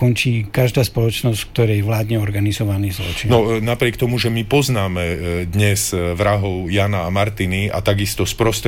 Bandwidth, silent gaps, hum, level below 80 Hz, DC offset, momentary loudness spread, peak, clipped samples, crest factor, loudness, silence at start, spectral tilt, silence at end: 17 kHz; none; none; -36 dBFS; 0.4%; 4 LU; -4 dBFS; under 0.1%; 14 dB; -18 LUFS; 0 s; -5.5 dB/octave; 0 s